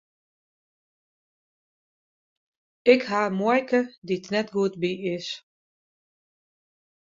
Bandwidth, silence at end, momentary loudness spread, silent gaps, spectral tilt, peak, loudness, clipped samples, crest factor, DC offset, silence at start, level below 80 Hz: 7.6 kHz; 1.6 s; 11 LU; 3.98-4.02 s; -5.5 dB/octave; -4 dBFS; -24 LUFS; under 0.1%; 24 dB; under 0.1%; 2.85 s; -72 dBFS